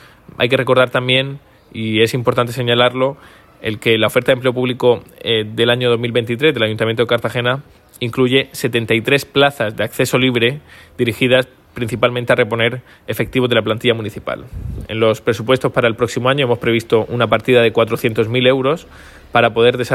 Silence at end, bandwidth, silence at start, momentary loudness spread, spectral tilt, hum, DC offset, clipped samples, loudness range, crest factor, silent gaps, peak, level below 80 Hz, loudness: 0 s; 15.5 kHz; 0.4 s; 11 LU; -5.5 dB/octave; none; under 0.1%; under 0.1%; 2 LU; 16 dB; none; 0 dBFS; -46 dBFS; -16 LUFS